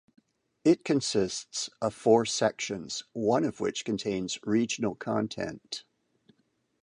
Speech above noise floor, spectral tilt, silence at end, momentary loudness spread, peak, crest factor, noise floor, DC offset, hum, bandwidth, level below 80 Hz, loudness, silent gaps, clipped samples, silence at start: 41 dB; -4.5 dB/octave; 1 s; 11 LU; -10 dBFS; 20 dB; -70 dBFS; under 0.1%; none; 11 kHz; -66 dBFS; -29 LUFS; none; under 0.1%; 0.65 s